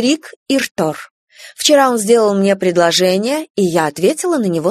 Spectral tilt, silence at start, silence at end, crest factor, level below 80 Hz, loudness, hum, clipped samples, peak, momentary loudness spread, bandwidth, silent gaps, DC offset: -4 dB/octave; 0 s; 0 s; 14 dB; -60 dBFS; -14 LUFS; none; under 0.1%; 0 dBFS; 7 LU; 13.5 kHz; 0.36-0.46 s, 0.71-0.75 s, 1.11-1.27 s, 3.50-3.55 s; under 0.1%